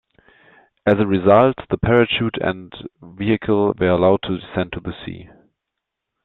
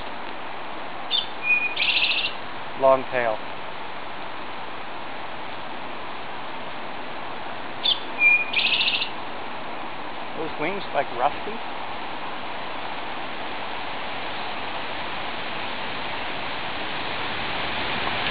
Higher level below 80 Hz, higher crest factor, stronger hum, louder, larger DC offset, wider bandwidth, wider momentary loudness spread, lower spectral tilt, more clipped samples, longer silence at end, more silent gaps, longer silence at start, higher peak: first, -46 dBFS vs -56 dBFS; about the same, 18 dB vs 22 dB; neither; first, -18 LUFS vs -25 LUFS; second, under 0.1% vs 3%; about the same, 4.3 kHz vs 4 kHz; first, 19 LU vs 15 LU; first, -9.5 dB/octave vs 0.5 dB/octave; neither; first, 1 s vs 0 s; neither; first, 0.85 s vs 0 s; about the same, -2 dBFS vs -4 dBFS